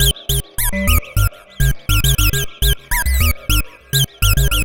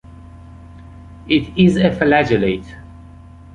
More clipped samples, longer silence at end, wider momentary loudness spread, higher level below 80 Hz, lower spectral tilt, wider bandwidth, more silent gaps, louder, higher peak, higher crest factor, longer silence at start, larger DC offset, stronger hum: neither; second, 0 s vs 0.6 s; second, 5 LU vs 24 LU; first, -20 dBFS vs -40 dBFS; second, -3 dB/octave vs -7 dB/octave; first, 17.5 kHz vs 9.4 kHz; neither; about the same, -17 LUFS vs -16 LUFS; about the same, -2 dBFS vs -2 dBFS; about the same, 14 dB vs 16 dB; about the same, 0 s vs 0.1 s; neither; neither